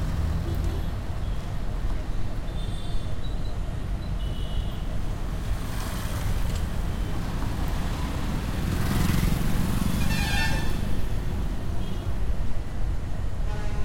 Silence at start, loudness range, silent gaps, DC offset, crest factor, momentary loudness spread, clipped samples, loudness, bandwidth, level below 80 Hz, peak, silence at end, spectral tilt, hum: 0 s; 6 LU; none; under 0.1%; 14 dB; 8 LU; under 0.1%; -30 LUFS; 16.5 kHz; -30 dBFS; -10 dBFS; 0 s; -5.5 dB/octave; none